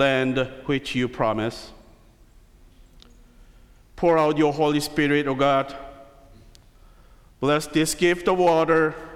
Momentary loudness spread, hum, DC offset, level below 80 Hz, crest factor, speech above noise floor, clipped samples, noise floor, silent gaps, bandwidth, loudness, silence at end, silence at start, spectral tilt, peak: 9 LU; none; under 0.1%; -50 dBFS; 16 dB; 31 dB; under 0.1%; -52 dBFS; none; 16 kHz; -22 LUFS; 0 s; 0 s; -5 dB/octave; -8 dBFS